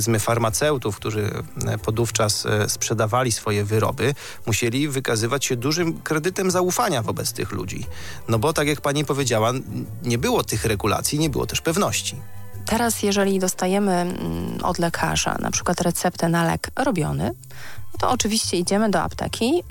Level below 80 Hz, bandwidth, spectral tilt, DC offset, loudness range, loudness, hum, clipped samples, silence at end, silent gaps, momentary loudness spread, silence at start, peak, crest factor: -44 dBFS; 17 kHz; -4.5 dB/octave; under 0.1%; 1 LU; -22 LUFS; none; under 0.1%; 0 s; none; 8 LU; 0 s; -4 dBFS; 18 dB